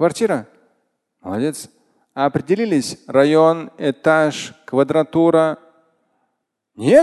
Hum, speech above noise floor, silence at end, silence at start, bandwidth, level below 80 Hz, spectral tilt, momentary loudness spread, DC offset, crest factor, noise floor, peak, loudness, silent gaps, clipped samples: none; 57 dB; 0 s; 0 s; 12.5 kHz; -60 dBFS; -6 dB/octave; 15 LU; under 0.1%; 18 dB; -74 dBFS; 0 dBFS; -18 LUFS; none; under 0.1%